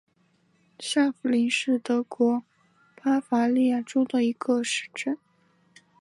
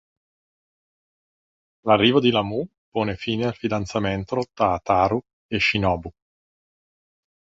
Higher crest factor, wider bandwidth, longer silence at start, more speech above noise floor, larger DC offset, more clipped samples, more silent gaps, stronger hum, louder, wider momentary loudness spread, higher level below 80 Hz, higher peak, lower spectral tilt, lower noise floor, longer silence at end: second, 14 dB vs 22 dB; first, 11.5 kHz vs 7.8 kHz; second, 0.8 s vs 1.85 s; second, 42 dB vs over 68 dB; neither; neither; second, none vs 2.78-2.92 s, 5.33-5.49 s; neither; second, -25 LUFS vs -22 LUFS; second, 8 LU vs 12 LU; second, -80 dBFS vs -48 dBFS; second, -12 dBFS vs -2 dBFS; second, -3.5 dB/octave vs -6 dB/octave; second, -66 dBFS vs under -90 dBFS; second, 0.85 s vs 1.45 s